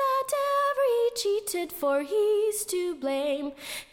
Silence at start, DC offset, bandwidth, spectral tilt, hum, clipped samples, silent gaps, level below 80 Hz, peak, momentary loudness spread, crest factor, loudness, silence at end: 0 s; under 0.1%; 17.5 kHz; -1.5 dB/octave; none; under 0.1%; none; -66 dBFS; -16 dBFS; 6 LU; 10 dB; -27 LUFS; 0.1 s